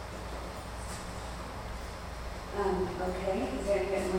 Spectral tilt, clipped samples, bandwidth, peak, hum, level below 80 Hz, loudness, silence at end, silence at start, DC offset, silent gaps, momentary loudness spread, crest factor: -5.5 dB/octave; under 0.1%; 16.5 kHz; -18 dBFS; none; -44 dBFS; -36 LUFS; 0 s; 0 s; under 0.1%; none; 10 LU; 16 dB